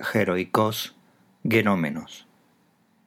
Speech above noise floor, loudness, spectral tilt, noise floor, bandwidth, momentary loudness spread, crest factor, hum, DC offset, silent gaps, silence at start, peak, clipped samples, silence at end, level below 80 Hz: 40 dB; -24 LUFS; -5.5 dB/octave; -63 dBFS; 18.5 kHz; 16 LU; 22 dB; none; under 0.1%; none; 0 s; -4 dBFS; under 0.1%; 0.85 s; -68 dBFS